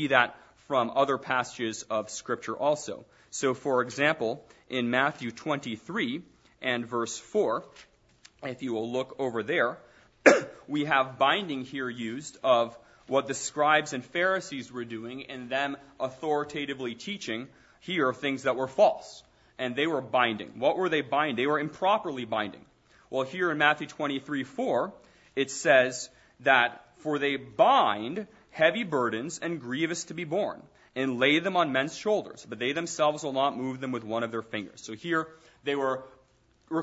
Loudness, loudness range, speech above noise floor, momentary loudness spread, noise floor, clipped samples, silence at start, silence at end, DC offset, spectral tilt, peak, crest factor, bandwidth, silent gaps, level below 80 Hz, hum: -28 LUFS; 6 LU; 36 dB; 13 LU; -65 dBFS; under 0.1%; 0 s; 0 s; under 0.1%; -4 dB/octave; -4 dBFS; 24 dB; 8 kHz; none; -70 dBFS; none